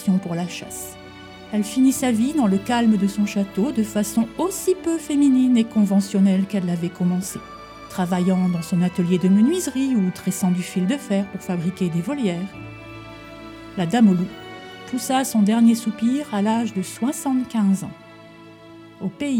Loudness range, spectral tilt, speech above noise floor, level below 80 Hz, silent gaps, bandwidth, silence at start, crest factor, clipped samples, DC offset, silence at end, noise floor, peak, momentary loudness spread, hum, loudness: 4 LU; -6 dB/octave; 23 dB; -56 dBFS; none; 17 kHz; 0 s; 16 dB; under 0.1%; under 0.1%; 0 s; -43 dBFS; -6 dBFS; 18 LU; none; -21 LUFS